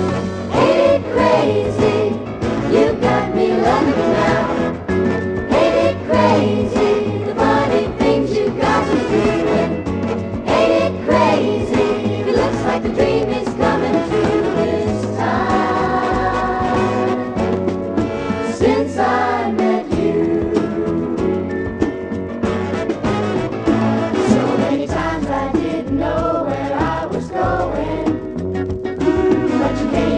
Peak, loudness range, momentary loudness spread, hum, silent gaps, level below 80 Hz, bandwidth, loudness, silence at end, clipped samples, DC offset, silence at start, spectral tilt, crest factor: -2 dBFS; 3 LU; 6 LU; none; none; -36 dBFS; 10 kHz; -17 LUFS; 0 s; under 0.1%; under 0.1%; 0 s; -6.5 dB/octave; 16 dB